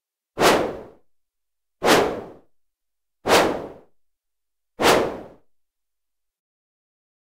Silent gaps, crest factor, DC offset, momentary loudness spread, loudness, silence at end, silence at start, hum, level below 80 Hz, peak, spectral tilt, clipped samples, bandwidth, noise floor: none; 22 dB; under 0.1%; 20 LU; -20 LUFS; 2.1 s; 0.35 s; none; -52 dBFS; -4 dBFS; -3 dB/octave; under 0.1%; 16 kHz; -87 dBFS